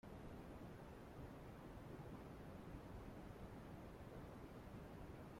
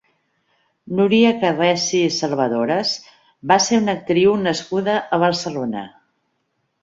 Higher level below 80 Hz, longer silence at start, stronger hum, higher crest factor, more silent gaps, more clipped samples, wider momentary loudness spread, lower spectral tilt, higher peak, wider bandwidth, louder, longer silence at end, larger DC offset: about the same, -64 dBFS vs -60 dBFS; second, 0.05 s vs 0.85 s; neither; about the same, 14 dB vs 18 dB; neither; neither; second, 1 LU vs 11 LU; first, -7 dB/octave vs -4.5 dB/octave; second, -42 dBFS vs -2 dBFS; first, 16.5 kHz vs 7.8 kHz; second, -57 LUFS vs -18 LUFS; second, 0 s vs 0.95 s; neither